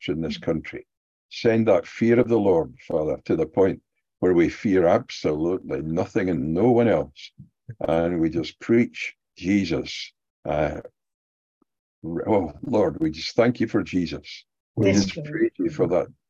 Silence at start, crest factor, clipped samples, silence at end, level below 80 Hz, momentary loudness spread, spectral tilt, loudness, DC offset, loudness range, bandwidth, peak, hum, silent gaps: 0 s; 18 dB; under 0.1%; 0.2 s; -48 dBFS; 15 LU; -6.5 dB/octave; -23 LUFS; under 0.1%; 5 LU; 7.8 kHz; -6 dBFS; none; 0.97-1.29 s, 10.30-10.43 s, 11.14-11.61 s, 11.79-12.02 s, 14.60-14.74 s